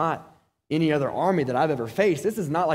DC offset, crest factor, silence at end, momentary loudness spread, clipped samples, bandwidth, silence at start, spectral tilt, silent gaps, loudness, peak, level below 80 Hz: under 0.1%; 16 dB; 0 s; 5 LU; under 0.1%; 16 kHz; 0 s; -6.5 dB/octave; none; -24 LUFS; -8 dBFS; -62 dBFS